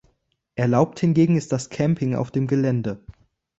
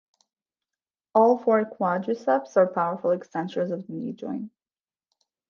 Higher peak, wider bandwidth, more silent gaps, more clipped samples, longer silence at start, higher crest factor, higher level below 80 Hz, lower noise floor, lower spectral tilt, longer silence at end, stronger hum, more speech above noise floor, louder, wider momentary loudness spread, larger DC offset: about the same, -4 dBFS vs -6 dBFS; first, 8.2 kHz vs 7 kHz; neither; neither; second, 0.55 s vs 1.15 s; about the same, 18 dB vs 20 dB; first, -54 dBFS vs -78 dBFS; second, -69 dBFS vs under -90 dBFS; about the same, -7.5 dB/octave vs -7.5 dB/octave; second, 0.5 s vs 1 s; neither; second, 48 dB vs over 66 dB; first, -22 LUFS vs -25 LUFS; second, 10 LU vs 14 LU; neither